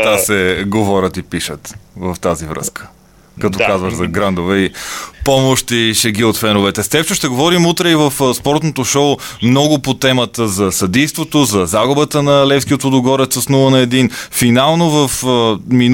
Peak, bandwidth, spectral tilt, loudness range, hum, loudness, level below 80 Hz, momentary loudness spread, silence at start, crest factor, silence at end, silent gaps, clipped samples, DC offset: 0 dBFS; 17 kHz; -4.5 dB/octave; 6 LU; none; -13 LUFS; -40 dBFS; 9 LU; 0 s; 12 dB; 0 s; none; under 0.1%; 0.2%